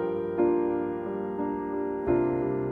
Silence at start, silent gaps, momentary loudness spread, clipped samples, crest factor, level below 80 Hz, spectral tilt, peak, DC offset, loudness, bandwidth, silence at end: 0 s; none; 6 LU; under 0.1%; 14 dB; -54 dBFS; -11 dB/octave; -14 dBFS; under 0.1%; -28 LUFS; 3.5 kHz; 0 s